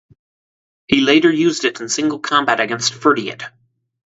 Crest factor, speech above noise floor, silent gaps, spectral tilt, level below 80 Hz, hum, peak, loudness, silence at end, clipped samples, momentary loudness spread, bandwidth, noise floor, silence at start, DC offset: 18 dB; over 74 dB; none; -3 dB/octave; -56 dBFS; none; 0 dBFS; -16 LUFS; 0.7 s; under 0.1%; 9 LU; 8 kHz; under -90 dBFS; 0.9 s; under 0.1%